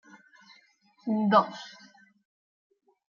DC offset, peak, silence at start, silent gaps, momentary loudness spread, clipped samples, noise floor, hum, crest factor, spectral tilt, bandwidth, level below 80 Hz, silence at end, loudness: under 0.1%; -8 dBFS; 1.05 s; none; 21 LU; under 0.1%; -63 dBFS; none; 22 dB; -4.5 dB/octave; 7 kHz; -82 dBFS; 1.4 s; -26 LUFS